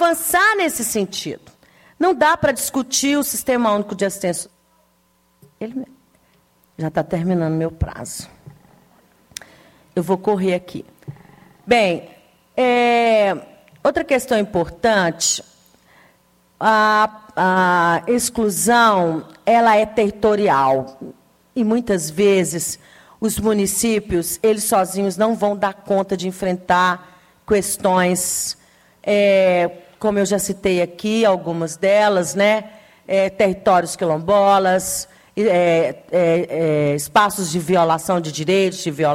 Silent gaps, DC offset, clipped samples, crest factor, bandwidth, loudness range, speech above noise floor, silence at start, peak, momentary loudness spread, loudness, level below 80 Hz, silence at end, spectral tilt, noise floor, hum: none; under 0.1%; under 0.1%; 16 dB; 17 kHz; 9 LU; 43 dB; 0 s; -2 dBFS; 13 LU; -18 LUFS; -48 dBFS; 0 s; -4 dB/octave; -60 dBFS; none